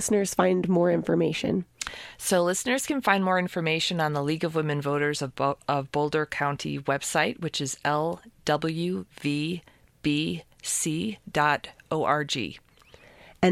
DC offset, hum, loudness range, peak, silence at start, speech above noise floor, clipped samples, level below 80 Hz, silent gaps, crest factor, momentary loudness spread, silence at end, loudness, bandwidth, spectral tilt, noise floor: under 0.1%; none; 4 LU; -4 dBFS; 0 s; 28 dB; under 0.1%; -60 dBFS; none; 22 dB; 8 LU; 0 s; -27 LUFS; 16 kHz; -4.5 dB/octave; -54 dBFS